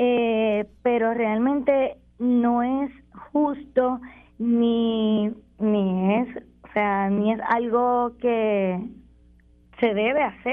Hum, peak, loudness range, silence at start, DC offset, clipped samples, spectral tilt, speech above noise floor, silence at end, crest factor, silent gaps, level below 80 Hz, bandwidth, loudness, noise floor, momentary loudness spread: none; -8 dBFS; 1 LU; 0 s; under 0.1%; under 0.1%; -9.5 dB/octave; 33 dB; 0 s; 16 dB; none; -56 dBFS; 3.8 kHz; -23 LUFS; -54 dBFS; 8 LU